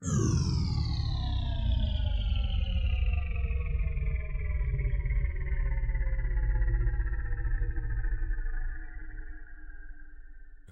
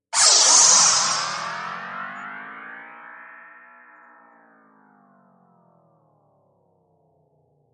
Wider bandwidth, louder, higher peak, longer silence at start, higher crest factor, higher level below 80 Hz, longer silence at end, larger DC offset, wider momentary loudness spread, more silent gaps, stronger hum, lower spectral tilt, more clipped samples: second, 8 kHz vs 11.5 kHz; second, -33 LUFS vs -14 LUFS; second, -18 dBFS vs 0 dBFS; second, 0 s vs 0.15 s; second, 12 dB vs 24 dB; first, -30 dBFS vs -74 dBFS; second, 0 s vs 4.45 s; neither; second, 16 LU vs 28 LU; neither; neither; first, -5.5 dB/octave vs 2 dB/octave; neither